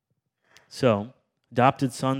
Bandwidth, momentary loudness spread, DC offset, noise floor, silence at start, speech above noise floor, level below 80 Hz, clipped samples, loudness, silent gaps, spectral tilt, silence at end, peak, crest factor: 15.5 kHz; 17 LU; under 0.1%; -73 dBFS; 0.75 s; 50 dB; -70 dBFS; under 0.1%; -24 LUFS; none; -6.5 dB/octave; 0 s; -4 dBFS; 22 dB